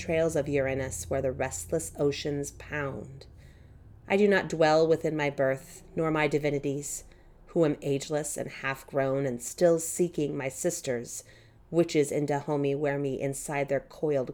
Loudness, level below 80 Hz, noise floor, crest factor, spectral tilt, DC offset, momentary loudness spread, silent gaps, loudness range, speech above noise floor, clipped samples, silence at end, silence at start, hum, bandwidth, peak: -29 LUFS; -54 dBFS; -52 dBFS; 18 dB; -5 dB/octave; under 0.1%; 10 LU; none; 4 LU; 23 dB; under 0.1%; 0 s; 0 s; none; 18.5 kHz; -12 dBFS